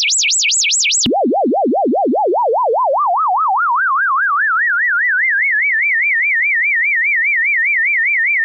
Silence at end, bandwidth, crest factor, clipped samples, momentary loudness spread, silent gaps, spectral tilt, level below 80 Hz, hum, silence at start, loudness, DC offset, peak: 0 s; 8.4 kHz; 8 dB; under 0.1%; 4 LU; none; 0 dB/octave; -56 dBFS; none; 0 s; -13 LUFS; under 0.1%; -6 dBFS